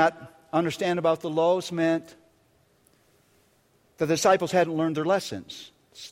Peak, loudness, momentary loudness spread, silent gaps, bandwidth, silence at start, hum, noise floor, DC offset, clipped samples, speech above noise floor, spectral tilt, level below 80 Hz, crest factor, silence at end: -6 dBFS; -25 LUFS; 17 LU; none; 16 kHz; 0 s; none; -64 dBFS; under 0.1%; under 0.1%; 40 dB; -5 dB/octave; -68 dBFS; 20 dB; 0.05 s